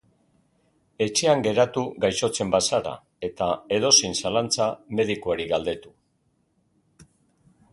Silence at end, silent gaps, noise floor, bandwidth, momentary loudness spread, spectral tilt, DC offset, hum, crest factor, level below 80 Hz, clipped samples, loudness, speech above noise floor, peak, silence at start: 0.7 s; none; -69 dBFS; 11.5 kHz; 11 LU; -3 dB/octave; under 0.1%; none; 22 dB; -56 dBFS; under 0.1%; -23 LUFS; 45 dB; -4 dBFS; 1 s